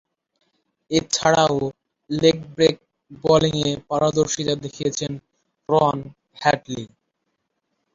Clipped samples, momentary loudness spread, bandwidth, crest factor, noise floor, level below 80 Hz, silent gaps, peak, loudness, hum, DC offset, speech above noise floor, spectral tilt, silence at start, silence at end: under 0.1%; 15 LU; 7.8 kHz; 20 dB; -75 dBFS; -52 dBFS; none; -2 dBFS; -21 LUFS; none; under 0.1%; 55 dB; -4.5 dB/octave; 0.9 s; 1.1 s